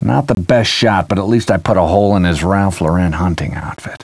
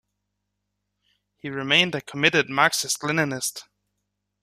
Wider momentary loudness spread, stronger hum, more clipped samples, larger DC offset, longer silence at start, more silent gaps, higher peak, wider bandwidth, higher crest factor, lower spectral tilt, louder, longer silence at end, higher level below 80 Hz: second, 7 LU vs 14 LU; second, none vs 50 Hz at -50 dBFS; neither; neither; second, 0 s vs 1.45 s; neither; about the same, 0 dBFS vs -2 dBFS; second, 11 kHz vs 15 kHz; second, 14 dB vs 24 dB; first, -6 dB/octave vs -2.5 dB/octave; first, -14 LUFS vs -22 LUFS; second, 0.05 s vs 0.8 s; first, -32 dBFS vs -66 dBFS